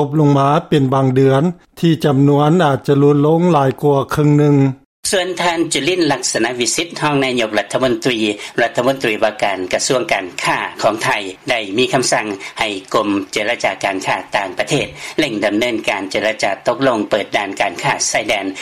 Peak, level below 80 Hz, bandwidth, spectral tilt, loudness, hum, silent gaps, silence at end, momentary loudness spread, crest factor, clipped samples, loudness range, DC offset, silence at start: -2 dBFS; -50 dBFS; 15 kHz; -4.5 dB/octave; -16 LUFS; none; 4.85-5.03 s; 0 s; 6 LU; 12 dB; under 0.1%; 4 LU; under 0.1%; 0 s